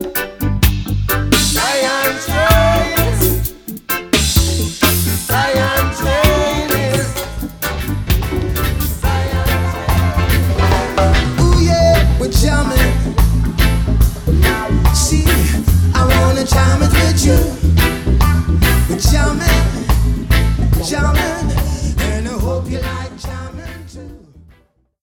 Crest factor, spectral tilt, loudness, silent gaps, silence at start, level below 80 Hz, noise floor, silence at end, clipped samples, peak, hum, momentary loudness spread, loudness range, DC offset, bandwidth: 14 dB; -5 dB/octave; -14 LUFS; none; 0 s; -18 dBFS; -54 dBFS; 0.85 s; under 0.1%; 0 dBFS; none; 8 LU; 5 LU; under 0.1%; over 20 kHz